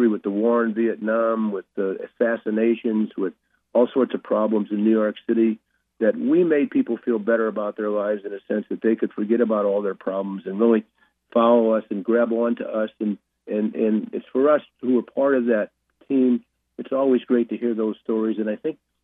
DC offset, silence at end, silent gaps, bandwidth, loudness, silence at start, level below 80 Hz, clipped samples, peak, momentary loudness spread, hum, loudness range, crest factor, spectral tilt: under 0.1%; 0.3 s; none; 3.8 kHz; -22 LUFS; 0 s; -78 dBFS; under 0.1%; -6 dBFS; 8 LU; none; 2 LU; 16 dB; -10.5 dB/octave